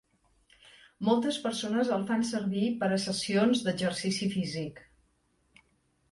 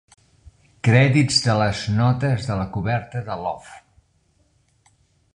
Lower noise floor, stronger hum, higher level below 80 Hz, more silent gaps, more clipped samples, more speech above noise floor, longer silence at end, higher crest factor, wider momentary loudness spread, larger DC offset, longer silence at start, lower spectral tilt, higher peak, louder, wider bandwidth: first, -71 dBFS vs -63 dBFS; neither; second, -68 dBFS vs -46 dBFS; neither; neither; about the same, 42 dB vs 43 dB; second, 1.3 s vs 1.55 s; about the same, 18 dB vs 20 dB; second, 6 LU vs 13 LU; neither; first, 1 s vs 0.45 s; about the same, -5 dB/octave vs -5.5 dB/octave; second, -12 dBFS vs -2 dBFS; second, -30 LUFS vs -20 LUFS; about the same, 11.5 kHz vs 10.5 kHz